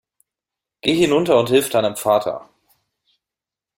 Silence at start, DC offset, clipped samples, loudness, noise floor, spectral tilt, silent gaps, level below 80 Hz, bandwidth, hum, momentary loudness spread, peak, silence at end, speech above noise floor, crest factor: 0.85 s; under 0.1%; under 0.1%; -18 LUFS; -88 dBFS; -4.5 dB/octave; none; -58 dBFS; 16.5 kHz; none; 9 LU; -2 dBFS; 1.35 s; 71 dB; 18 dB